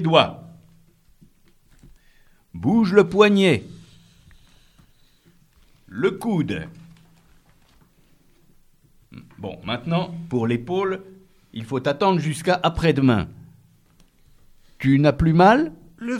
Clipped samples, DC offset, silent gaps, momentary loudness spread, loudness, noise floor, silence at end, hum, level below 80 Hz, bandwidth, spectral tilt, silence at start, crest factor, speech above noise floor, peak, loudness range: under 0.1%; under 0.1%; none; 20 LU; -20 LUFS; -57 dBFS; 0 s; none; -46 dBFS; 13.5 kHz; -6.5 dB/octave; 0 s; 22 dB; 37 dB; 0 dBFS; 10 LU